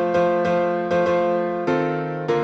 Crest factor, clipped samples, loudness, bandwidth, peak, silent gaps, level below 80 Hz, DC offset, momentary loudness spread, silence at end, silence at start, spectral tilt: 12 dB; under 0.1%; -21 LUFS; 7.4 kHz; -8 dBFS; none; -58 dBFS; under 0.1%; 4 LU; 0 s; 0 s; -7.5 dB/octave